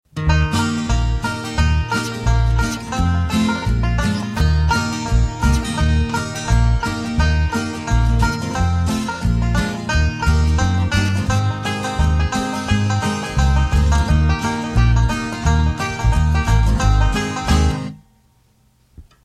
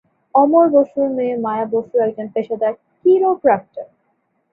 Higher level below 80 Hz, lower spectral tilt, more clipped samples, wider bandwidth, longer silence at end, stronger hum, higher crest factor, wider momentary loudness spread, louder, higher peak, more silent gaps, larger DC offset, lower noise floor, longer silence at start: first, -20 dBFS vs -64 dBFS; second, -5.5 dB/octave vs -10 dB/octave; neither; first, 13 kHz vs 3.9 kHz; second, 0.25 s vs 0.7 s; neither; about the same, 14 dB vs 16 dB; second, 4 LU vs 10 LU; about the same, -18 LUFS vs -17 LUFS; about the same, -2 dBFS vs -2 dBFS; neither; neither; second, -57 dBFS vs -66 dBFS; second, 0.15 s vs 0.35 s